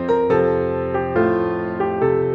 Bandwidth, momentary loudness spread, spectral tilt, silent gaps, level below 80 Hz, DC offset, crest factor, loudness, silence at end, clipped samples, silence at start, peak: 5.2 kHz; 5 LU; -9.5 dB/octave; none; -46 dBFS; under 0.1%; 14 dB; -19 LUFS; 0 s; under 0.1%; 0 s; -6 dBFS